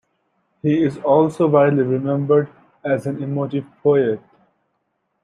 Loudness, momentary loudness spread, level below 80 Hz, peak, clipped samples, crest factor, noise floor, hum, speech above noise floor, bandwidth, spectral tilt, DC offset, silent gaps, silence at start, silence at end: -18 LUFS; 10 LU; -64 dBFS; -2 dBFS; under 0.1%; 16 dB; -71 dBFS; none; 54 dB; 11 kHz; -9 dB/octave; under 0.1%; none; 0.65 s; 1.05 s